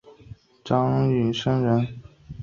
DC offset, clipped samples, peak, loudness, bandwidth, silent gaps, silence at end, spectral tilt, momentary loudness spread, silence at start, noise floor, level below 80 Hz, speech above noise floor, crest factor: under 0.1%; under 0.1%; -6 dBFS; -23 LUFS; 7.2 kHz; none; 0 s; -8 dB/octave; 22 LU; 0.3 s; -47 dBFS; -52 dBFS; 25 dB; 18 dB